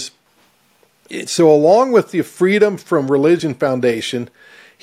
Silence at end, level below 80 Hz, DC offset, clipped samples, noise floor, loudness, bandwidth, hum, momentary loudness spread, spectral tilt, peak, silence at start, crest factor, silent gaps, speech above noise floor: 0.55 s; -64 dBFS; under 0.1%; under 0.1%; -56 dBFS; -15 LUFS; 15 kHz; none; 16 LU; -5.5 dB/octave; 0 dBFS; 0 s; 16 dB; none; 42 dB